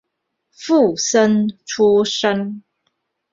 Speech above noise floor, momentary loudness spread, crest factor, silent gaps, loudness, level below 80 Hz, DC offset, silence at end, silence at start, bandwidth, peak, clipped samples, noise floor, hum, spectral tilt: 59 dB; 13 LU; 16 dB; none; -16 LUFS; -60 dBFS; under 0.1%; 0.75 s; 0.6 s; 7.8 kHz; -2 dBFS; under 0.1%; -75 dBFS; none; -4 dB/octave